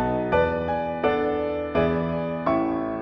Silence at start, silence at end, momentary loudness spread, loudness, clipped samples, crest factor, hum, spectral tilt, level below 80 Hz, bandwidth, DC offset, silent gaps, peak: 0 s; 0 s; 4 LU; -24 LUFS; under 0.1%; 14 dB; none; -9 dB/octave; -44 dBFS; 5.8 kHz; under 0.1%; none; -10 dBFS